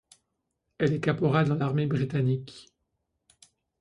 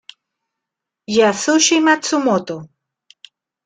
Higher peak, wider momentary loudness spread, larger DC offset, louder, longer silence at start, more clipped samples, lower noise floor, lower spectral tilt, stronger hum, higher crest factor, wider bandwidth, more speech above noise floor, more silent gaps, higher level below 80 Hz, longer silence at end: second, -10 dBFS vs -2 dBFS; second, 5 LU vs 11 LU; neither; second, -27 LUFS vs -15 LUFS; second, 0.8 s vs 1.1 s; neither; about the same, -80 dBFS vs -83 dBFS; first, -8 dB/octave vs -2.5 dB/octave; neither; about the same, 20 dB vs 18 dB; first, 11 kHz vs 9.6 kHz; second, 54 dB vs 67 dB; neither; about the same, -62 dBFS vs -64 dBFS; first, 1.2 s vs 1 s